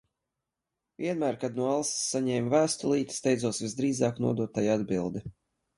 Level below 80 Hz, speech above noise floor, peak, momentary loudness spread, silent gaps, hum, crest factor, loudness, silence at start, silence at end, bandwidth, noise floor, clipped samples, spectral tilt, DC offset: -64 dBFS; 58 dB; -10 dBFS; 7 LU; none; none; 18 dB; -29 LUFS; 1 s; 0.45 s; 11.5 kHz; -87 dBFS; under 0.1%; -5 dB/octave; under 0.1%